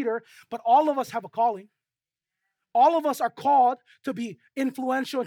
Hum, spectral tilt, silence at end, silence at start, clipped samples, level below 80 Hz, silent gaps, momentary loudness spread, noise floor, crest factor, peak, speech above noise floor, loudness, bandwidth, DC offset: none; -4.5 dB/octave; 0 s; 0 s; under 0.1%; -84 dBFS; none; 14 LU; under -90 dBFS; 16 dB; -8 dBFS; over 66 dB; -25 LUFS; 17.5 kHz; under 0.1%